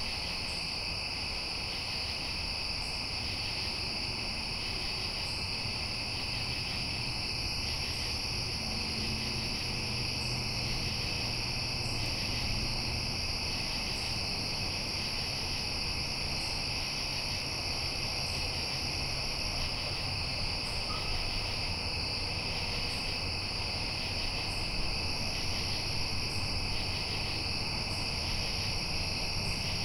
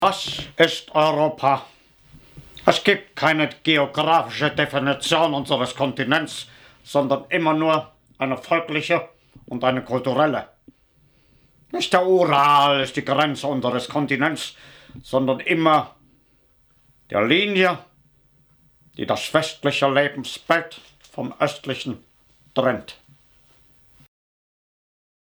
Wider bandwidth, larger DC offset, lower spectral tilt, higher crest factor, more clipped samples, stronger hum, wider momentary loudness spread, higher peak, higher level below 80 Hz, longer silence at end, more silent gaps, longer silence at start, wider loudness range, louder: second, 16 kHz vs over 20 kHz; neither; second, -3 dB/octave vs -4.5 dB/octave; second, 14 dB vs 22 dB; neither; neither; second, 1 LU vs 13 LU; second, -20 dBFS vs 0 dBFS; first, -42 dBFS vs -60 dBFS; second, 0 s vs 2.35 s; neither; about the same, 0 s vs 0 s; second, 1 LU vs 6 LU; second, -33 LUFS vs -21 LUFS